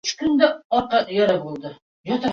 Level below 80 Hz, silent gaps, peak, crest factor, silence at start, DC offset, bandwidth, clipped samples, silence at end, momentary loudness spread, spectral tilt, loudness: -58 dBFS; 0.64-0.70 s, 1.82-2.04 s; -2 dBFS; 18 dB; 0.05 s; under 0.1%; 7.6 kHz; under 0.1%; 0 s; 16 LU; -4.5 dB/octave; -20 LUFS